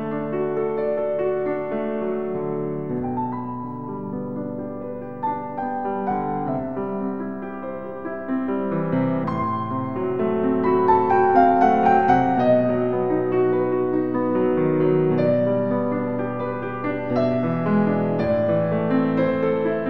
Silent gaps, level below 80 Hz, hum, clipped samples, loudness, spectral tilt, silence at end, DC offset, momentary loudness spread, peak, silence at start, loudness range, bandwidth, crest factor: none; -52 dBFS; none; under 0.1%; -22 LUFS; -10 dB/octave; 0 s; 0.8%; 12 LU; -4 dBFS; 0 s; 9 LU; 5.8 kHz; 18 dB